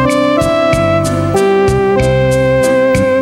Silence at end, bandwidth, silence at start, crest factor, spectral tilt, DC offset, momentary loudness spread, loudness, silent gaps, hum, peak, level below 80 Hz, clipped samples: 0 s; 16.5 kHz; 0 s; 10 dB; -6 dB/octave; under 0.1%; 2 LU; -11 LUFS; none; none; -2 dBFS; -28 dBFS; under 0.1%